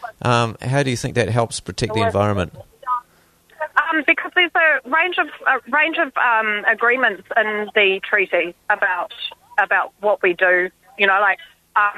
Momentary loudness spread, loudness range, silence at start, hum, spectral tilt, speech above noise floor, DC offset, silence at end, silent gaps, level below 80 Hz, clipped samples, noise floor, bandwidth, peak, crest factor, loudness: 9 LU; 4 LU; 0 s; none; -4.5 dB/octave; 37 dB; under 0.1%; 0 s; none; -52 dBFS; under 0.1%; -55 dBFS; 13.5 kHz; -2 dBFS; 18 dB; -18 LUFS